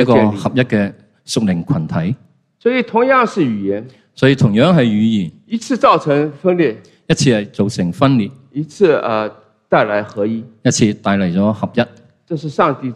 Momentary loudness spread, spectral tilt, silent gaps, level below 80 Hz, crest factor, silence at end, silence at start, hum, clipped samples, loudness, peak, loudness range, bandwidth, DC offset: 11 LU; -6 dB/octave; none; -50 dBFS; 14 dB; 0 s; 0 s; none; under 0.1%; -15 LUFS; 0 dBFS; 3 LU; 11.5 kHz; under 0.1%